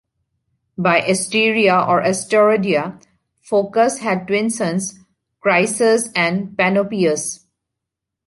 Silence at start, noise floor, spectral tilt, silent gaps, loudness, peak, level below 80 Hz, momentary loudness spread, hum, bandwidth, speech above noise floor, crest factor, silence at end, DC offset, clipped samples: 0.8 s; -82 dBFS; -4 dB/octave; none; -17 LUFS; -2 dBFS; -62 dBFS; 9 LU; none; 11.5 kHz; 65 dB; 18 dB; 0.9 s; under 0.1%; under 0.1%